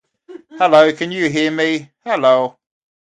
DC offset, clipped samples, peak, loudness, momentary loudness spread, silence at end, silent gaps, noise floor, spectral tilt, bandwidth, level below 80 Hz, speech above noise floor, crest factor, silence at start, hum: under 0.1%; under 0.1%; 0 dBFS; -15 LUFS; 11 LU; 0.7 s; none; -40 dBFS; -5 dB/octave; 9.2 kHz; -64 dBFS; 25 dB; 16 dB; 0.3 s; none